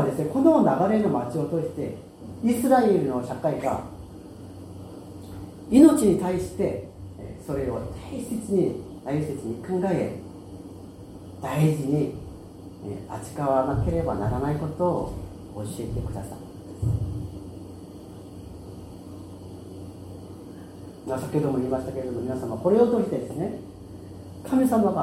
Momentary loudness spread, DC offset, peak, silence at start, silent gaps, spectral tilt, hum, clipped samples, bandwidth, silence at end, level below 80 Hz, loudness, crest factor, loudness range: 21 LU; under 0.1%; -2 dBFS; 0 s; none; -7.5 dB/octave; none; under 0.1%; 16 kHz; 0 s; -46 dBFS; -25 LUFS; 24 dB; 12 LU